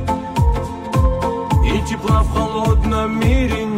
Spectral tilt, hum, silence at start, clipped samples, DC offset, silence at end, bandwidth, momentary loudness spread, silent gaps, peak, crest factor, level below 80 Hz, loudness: -7 dB/octave; none; 0 s; under 0.1%; under 0.1%; 0 s; 15.5 kHz; 4 LU; none; -4 dBFS; 12 dB; -20 dBFS; -18 LUFS